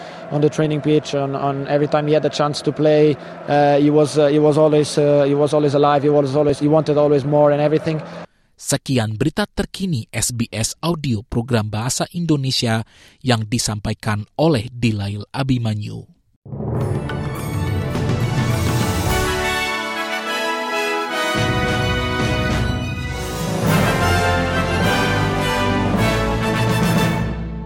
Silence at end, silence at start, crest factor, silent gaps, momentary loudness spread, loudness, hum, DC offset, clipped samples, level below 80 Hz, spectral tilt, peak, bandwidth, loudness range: 0 s; 0 s; 16 dB; 16.36-16.42 s; 9 LU; -18 LUFS; none; under 0.1%; under 0.1%; -36 dBFS; -5.5 dB/octave; -2 dBFS; 16.5 kHz; 7 LU